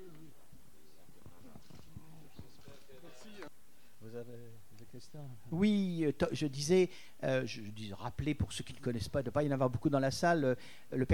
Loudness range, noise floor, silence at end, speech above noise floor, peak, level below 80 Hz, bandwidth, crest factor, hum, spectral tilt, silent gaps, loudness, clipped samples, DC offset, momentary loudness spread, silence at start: 21 LU; -66 dBFS; 0 s; 32 dB; -18 dBFS; -60 dBFS; 19 kHz; 18 dB; none; -6 dB/octave; none; -35 LUFS; under 0.1%; 0.4%; 25 LU; 0 s